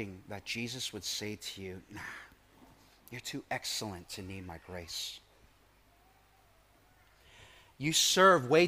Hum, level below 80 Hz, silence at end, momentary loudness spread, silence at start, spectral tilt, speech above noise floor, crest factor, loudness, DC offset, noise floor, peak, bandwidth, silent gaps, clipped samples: none; -68 dBFS; 0 s; 22 LU; 0 s; -3 dB/octave; 32 dB; 24 dB; -32 LUFS; under 0.1%; -65 dBFS; -10 dBFS; 15.5 kHz; none; under 0.1%